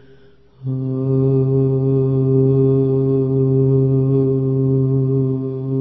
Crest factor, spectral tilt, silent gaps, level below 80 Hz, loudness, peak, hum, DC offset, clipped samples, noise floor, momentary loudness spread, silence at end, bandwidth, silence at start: 12 dB; -15.5 dB/octave; none; -46 dBFS; -17 LUFS; -4 dBFS; none; under 0.1%; under 0.1%; -49 dBFS; 7 LU; 0 s; 2.7 kHz; 0.6 s